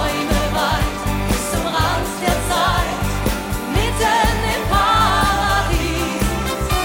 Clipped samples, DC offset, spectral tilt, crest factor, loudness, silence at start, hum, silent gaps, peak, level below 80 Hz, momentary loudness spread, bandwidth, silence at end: under 0.1%; 0.2%; -4 dB/octave; 14 dB; -18 LUFS; 0 s; none; none; -4 dBFS; -24 dBFS; 6 LU; 16.5 kHz; 0 s